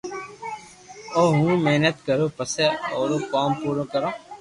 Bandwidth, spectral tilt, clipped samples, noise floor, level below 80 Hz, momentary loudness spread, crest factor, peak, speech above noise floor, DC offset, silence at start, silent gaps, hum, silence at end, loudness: 11.5 kHz; -5.5 dB/octave; under 0.1%; -44 dBFS; -60 dBFS; 16 LU; 18 dB; -6 dBFS; 22 dB; under 0.1%; 0.05 s; none; none; 0 s; -22 LUFS